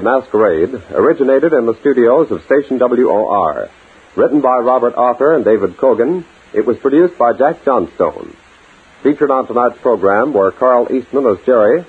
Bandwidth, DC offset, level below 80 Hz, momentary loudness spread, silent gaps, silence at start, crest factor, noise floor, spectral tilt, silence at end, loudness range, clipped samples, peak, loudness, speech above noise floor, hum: 7.8 kHz; under 0.1%; -52 dBFS; 6 LU; none; 0 s; 12 dB; -44 dBFS; -8.5 dB/octave; 0.05 s; 2 LU; under 0.1%; 0 dBFS; -13 LUFS; 32 dB; none